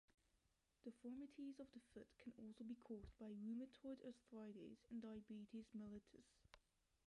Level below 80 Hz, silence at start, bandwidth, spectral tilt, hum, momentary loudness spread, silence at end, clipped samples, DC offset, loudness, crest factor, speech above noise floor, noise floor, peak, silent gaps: -78 dBFS; 0.1 s; 11 kHz; -7 dB/octave; none; 8 LU; 0.5 s; under 0.1%; under 0.1%; -58 LUFS; 14 dB; 29 dB; -86 dBFS; -44 dBFS; 0.14-0.18 s